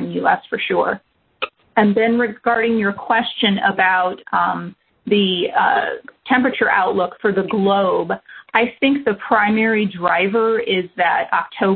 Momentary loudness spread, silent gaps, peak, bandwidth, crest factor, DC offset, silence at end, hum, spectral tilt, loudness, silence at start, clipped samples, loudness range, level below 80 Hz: 7 LU; none; 0 dBFS; 4.5 kHz; 18 dB; under 0.1%; 0 s; none; -9.5 dB/octave; -17 LUFS; 0 s; under 0.1%; 1 LU; -58 dBFS